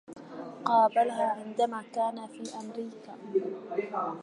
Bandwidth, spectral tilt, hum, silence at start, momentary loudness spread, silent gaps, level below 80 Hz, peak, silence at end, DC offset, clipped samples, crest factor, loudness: 11 kHz; -5 dB/octave; none; 0.1 s; 18 LU; none; -86 dBFS; -12 dBFS; 0 s; under 0.1%; under 0.1%; 20 dB; -30 LUFS